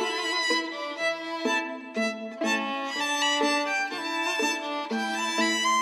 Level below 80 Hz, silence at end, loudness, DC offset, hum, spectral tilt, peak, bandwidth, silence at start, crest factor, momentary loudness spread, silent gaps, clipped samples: under -90 dBFS; 0 s; -27 LUFS; under 0.1%; none; -1 dB/octave; -12 dBFS; 15.5 kHz; 0 s; 16 dB; 6 LU; none; under 0.1%